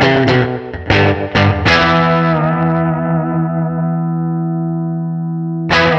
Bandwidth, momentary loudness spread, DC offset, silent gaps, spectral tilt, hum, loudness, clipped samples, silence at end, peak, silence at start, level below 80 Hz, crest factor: 7.2 kHz; 9 LU; under 0.1%; none; -7 dB/octave; none; -14 LUFS; under 0.1%; 0 s; 0 dBFS; 0 s; -36 dBFS; 14 dB